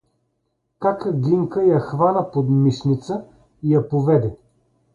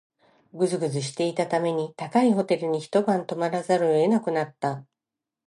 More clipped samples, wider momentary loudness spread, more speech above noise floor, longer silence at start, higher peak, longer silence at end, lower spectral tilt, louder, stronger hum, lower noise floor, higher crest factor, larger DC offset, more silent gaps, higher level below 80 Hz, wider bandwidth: neither; about the same, 8 LU vs 7 LU; second, 54 dB vs 64 dB; first, 0.8 s vs 0.55 s; first, -4 dBFS vs -8 dBFS; about the same, 0.6 s vs 0.65 s; first, -9.5 dB/octave vs -6 dB/octave; first, -20 LUFS vs -25 LUFS; neither; second, -72 dBFS vs -88 dBFS; about the same, 16 dB vs 18 dB; neither; neither; first, -54 dBFS vs -78 dBFS; second, 7.2 kHz vs 11.5 kHz